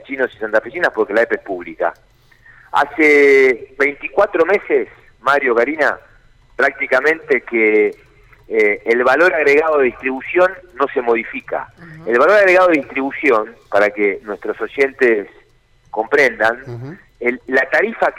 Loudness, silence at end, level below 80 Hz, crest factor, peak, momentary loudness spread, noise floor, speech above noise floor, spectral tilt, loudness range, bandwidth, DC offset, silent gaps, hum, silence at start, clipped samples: -15 LUFS; 0 s; -52 dBFS; 12 dB; -4 dBFS; 13 LU; -53 dBFS; 37 dB; -5 dB/octave; 3 LU; 12 kHz; under 0.1%; none; none; 0.1 s; under 0.1%